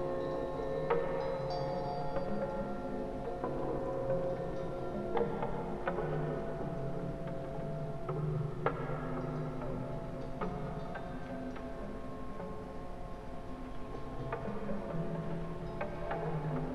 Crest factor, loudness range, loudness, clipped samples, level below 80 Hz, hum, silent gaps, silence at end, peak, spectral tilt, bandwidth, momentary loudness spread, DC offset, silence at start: 20 dB; 6 LU; -39 LUFS; under 0.1%; -48 dBFS; none; none; 0 s; -16 dBFS; -8.5 dB/octave; 11.5 kHz; 9 LU; under 0.1%; 0 s